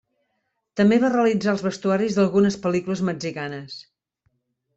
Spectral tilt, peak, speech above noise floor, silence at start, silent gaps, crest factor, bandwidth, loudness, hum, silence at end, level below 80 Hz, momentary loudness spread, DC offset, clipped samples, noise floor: -6.5 dB/octave; -8 dBFS; 54 dB; 0.75 s; none; 14 dB; 8 kHz; -21 LUFS; none; 0.95 s; -62 dBFS; 15 LU; under 0.1%; under 0.1%; -75 dBFS